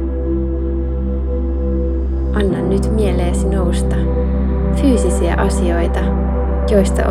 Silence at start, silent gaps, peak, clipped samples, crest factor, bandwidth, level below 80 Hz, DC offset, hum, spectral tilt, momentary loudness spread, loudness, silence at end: 0 s; none; -2 dBFS; under 0.1%; 14 dB; 11.5 kHz; -18 dBFS; under 0.1%; none; -7 dB/octave; 6 LU; -17 LUFS; 0 s